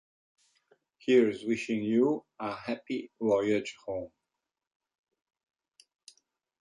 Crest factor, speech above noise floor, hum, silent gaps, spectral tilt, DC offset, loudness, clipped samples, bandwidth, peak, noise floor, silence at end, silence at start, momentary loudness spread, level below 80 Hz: 20 dB; 58 dB; none; none; -6 dB/octave; under 0.1%; -30 LUFS; under 0.1%; 11 kHz; -12 dBFS; -87 dBFS; 2.55 s; 1.05 s; 14 LU; -72 dBFS